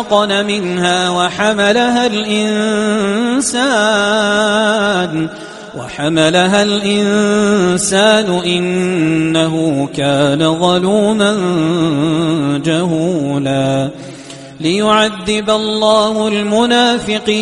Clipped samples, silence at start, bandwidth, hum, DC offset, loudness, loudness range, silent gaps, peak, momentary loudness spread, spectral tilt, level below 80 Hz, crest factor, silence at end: under 0.1%; 0 s; 11.5 kHz; none; under 0.1%; -13 LUFS; 3 LU; none; 0 dBFS; 5 LU; -4.5 dB/octave; -48 dBFS; 14 dB; 0 s